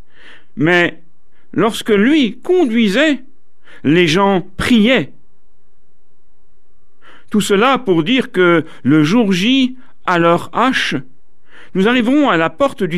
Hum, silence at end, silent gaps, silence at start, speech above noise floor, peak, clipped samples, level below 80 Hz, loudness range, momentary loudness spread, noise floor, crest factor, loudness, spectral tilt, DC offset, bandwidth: none; 0 s; none; 0.55 s; 47 dB; -2 dBFS; under 0.1%; -46 dBFS; 4 LU; 8 LU; -60 dBFS; 14 dB; -14 LUFS; -5.5 dB/octave; 3%; 14.5 kHz